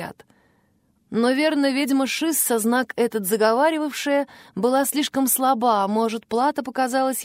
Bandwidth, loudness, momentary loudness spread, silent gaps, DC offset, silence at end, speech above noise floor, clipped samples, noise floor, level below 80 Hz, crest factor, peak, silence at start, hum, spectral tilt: 16 kHz; -21 LUFS; 5 LU; none; under 0.1%; 0 s; 43 dB; under 0.1%; -64 dBFS; -70 dBFS; 16 dB; -6 dBFS; 0 s; none; -3 dB/octave